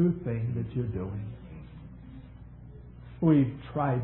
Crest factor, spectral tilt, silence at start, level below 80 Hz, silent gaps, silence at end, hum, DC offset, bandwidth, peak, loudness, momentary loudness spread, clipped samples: 18 dB; -12.5 dB/octave; 0 s; -50 dBFS; none; 0 s; 60 Hz at -50 dBFS; under 0.1%; 4 kHz; -12 dBFS; -29 LUFS; 24 LU; under 0.1%